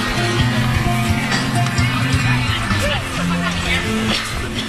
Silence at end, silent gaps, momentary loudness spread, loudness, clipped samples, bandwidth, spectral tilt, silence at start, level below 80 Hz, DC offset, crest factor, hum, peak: 0 s; none; 2 LU; -18 LUFS; under 0.1%; 14 kHz; -4.5 dB/octave; 0 s; -30 dBFS; under 0.1%; 14 dB; none; -4 dBFS